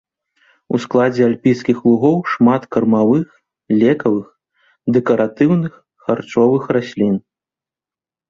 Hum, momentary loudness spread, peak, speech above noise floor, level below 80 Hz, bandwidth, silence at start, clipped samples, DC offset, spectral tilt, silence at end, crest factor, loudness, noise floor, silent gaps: none; 8 LU; -2 dBFS; over 75 dB; -56 dBFS; 7.2 kHz; 0.7 s; under 0.1%; under 0.1%; -8 dB/octave; 1.1 s; 14 dB; -16 LUFS; under -90 dBFS; none